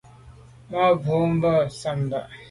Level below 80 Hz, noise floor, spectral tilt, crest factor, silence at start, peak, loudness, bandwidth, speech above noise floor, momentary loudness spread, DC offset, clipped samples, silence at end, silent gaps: -52 dBFS; -47 dBFS; -7.5 dB/octave; 16 dB; 0.25 s; -8 dBFS; -23 LUFS; 11.5 kHz; 25 dB; 9 LU; under 0.1%; under 0.1%; 0 s; none